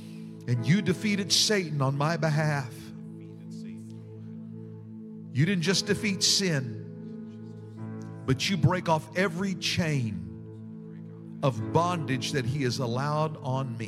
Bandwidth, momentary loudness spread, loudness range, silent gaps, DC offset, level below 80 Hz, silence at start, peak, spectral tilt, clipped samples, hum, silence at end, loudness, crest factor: 15 kHz; 19 LU; 5 LU; none; under 0.1%; -62 dBFS; 0 s; -8 dBFS; -4.5 dB/octave; under 0.1%; none; 0 s; -27 LUFS; 20 dB